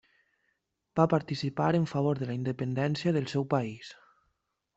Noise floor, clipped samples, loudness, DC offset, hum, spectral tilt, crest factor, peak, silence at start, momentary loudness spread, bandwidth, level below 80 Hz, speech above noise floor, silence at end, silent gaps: -79 dBFS; under 0.1%; -30 LUFS; under 0.1%; none; -7.5 dB/octave; 22 dB; -10 dBFS; 0.95 s; 9 LU; 8 kHz; -66 dBFS; 50 dB; 0.85 s; none